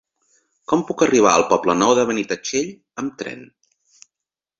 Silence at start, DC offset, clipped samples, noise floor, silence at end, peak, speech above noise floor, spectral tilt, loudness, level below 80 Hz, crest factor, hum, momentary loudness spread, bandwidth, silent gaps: 0.7 s; under 0.1%; under 0.1%; -86 dBFS; 1.15 s; -2 dBFS; 68 dB; -3.5 dB/octave; -18 LUFS; -58 dBFS; 20 dB; none; 17 LU; 7.8 kHz; none